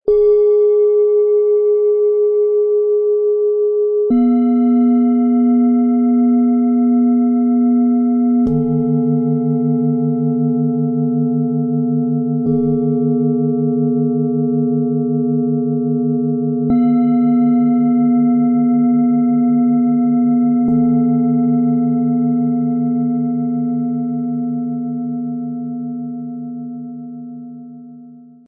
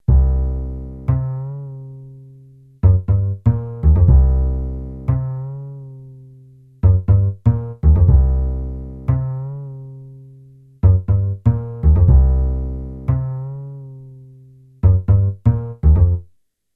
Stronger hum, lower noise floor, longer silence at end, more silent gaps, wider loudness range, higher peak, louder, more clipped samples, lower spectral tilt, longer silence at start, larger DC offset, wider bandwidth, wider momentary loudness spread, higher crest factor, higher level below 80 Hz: neither; second, -39 dBFS vs -55 dBFS; second, 0.25 s vs 0.55 s; neither; first, 7 LU vs 4 LU; second, -6 dBFS vs 0 dBFS; about the same, -15 LUFS vs -17 LUFS; neither; first, -14.5 dB/octave vs -13 dB/octave; about the same, 0.05 s vs 0.1 s; neither; about the same, 2.2 kHz vs 2.3 kHz; second, 9 LU vs 20 LU; second, 8 dB vs 16 dB; second, -52 dBFS vs -20 dBFS